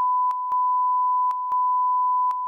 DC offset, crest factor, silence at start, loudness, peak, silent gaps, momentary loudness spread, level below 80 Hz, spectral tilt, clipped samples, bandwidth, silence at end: under 0.1%; 4 dB; 0 s; -22 LUFS; -18 dBFS; none; 2 LU; -82 dBFS; 5 dB/octave; under 0.1%; 2.6 kHz; 0 s